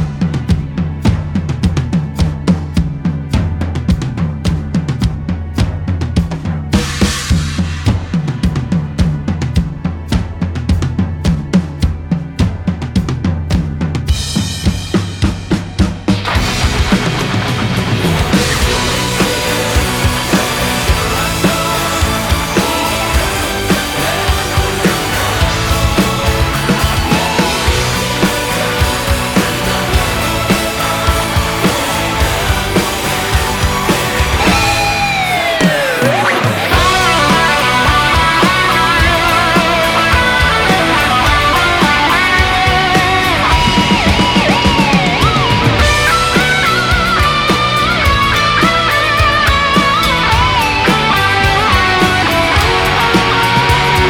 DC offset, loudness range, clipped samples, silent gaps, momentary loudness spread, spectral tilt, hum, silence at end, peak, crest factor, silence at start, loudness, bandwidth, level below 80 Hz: under 0.1%; 7 LU; under 0.1%; none; 7 LU; -4.5 dB/octave; none; 0 s; 0 dBFS; 12 dB; 0 s; -12 LUFS; 19.5 kHz; -22 dBFS